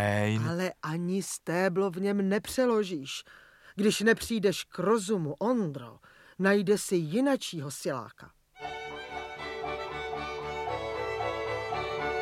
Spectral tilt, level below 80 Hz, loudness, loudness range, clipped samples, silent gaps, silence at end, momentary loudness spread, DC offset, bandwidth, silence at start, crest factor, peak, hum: -5 dB/octave; -58 dBFS; -30 LUFS; 7 LU; under 0.1%; none; 0 s; 13 LU; under 0.1%; 16 kHz; 0 s; 20 dB; -10 dBFS; none